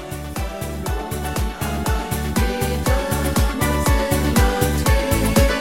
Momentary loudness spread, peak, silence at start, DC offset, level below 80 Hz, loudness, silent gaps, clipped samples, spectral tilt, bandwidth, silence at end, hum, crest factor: 9 LU; -2 dBFS; 0 s; 0.5%; -24 dBFS; -20 LUFS; none; under 0.1%; -5 dB/octave; 17 kHz; 0 s; none; 18 dB